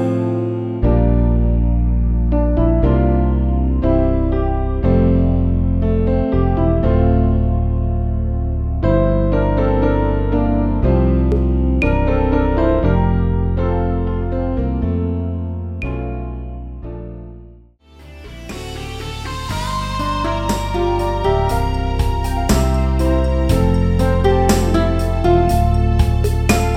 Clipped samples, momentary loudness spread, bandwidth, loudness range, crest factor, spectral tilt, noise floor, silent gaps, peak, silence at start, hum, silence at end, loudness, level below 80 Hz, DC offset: under 0.1%; 10 LU; 15.5 kHz; 10 LU; 14 dB; -7.5 dB/octave; -44 dBFS; none; -2 dBFS; 0 s; none; 0 s; -17 LUFS; -20 dBFS; under 0.1%